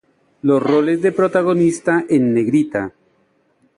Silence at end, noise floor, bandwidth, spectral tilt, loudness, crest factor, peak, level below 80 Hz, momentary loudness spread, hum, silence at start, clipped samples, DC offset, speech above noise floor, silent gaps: 0.9 s; -60 dBFS; 11 kHz; -7 dB/octave; -16 LUFS; 14 dB; -2 dBFS; -58 dBFS; 7 LU; none; 0.45 s; under 0.1%; under 0.1%; 45 dB; none